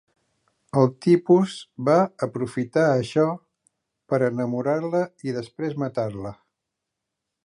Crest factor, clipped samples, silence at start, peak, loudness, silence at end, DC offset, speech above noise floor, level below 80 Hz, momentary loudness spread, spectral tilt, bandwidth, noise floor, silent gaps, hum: 18 dB; under 0.1%; 0.75 s; -6 dBFS; -23 LUFS; 1.1 s; under 0.1%; 61 dB; -64 dBFS; 11 LU; -7.5 dB/octave; 11 kHz; -83 dBFS; none; none